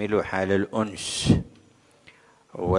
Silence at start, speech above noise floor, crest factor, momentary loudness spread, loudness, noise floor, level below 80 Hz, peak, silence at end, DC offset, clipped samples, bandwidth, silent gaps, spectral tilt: 0 s; 33 dB; 22 dB; 14 LU; -25 LUFS; -57 dBFS; -46 dBFS; -4 dBFS; 0 s; under 0.1%; under 0.1%; 11.5 kHz; none; -5.5 dB/octave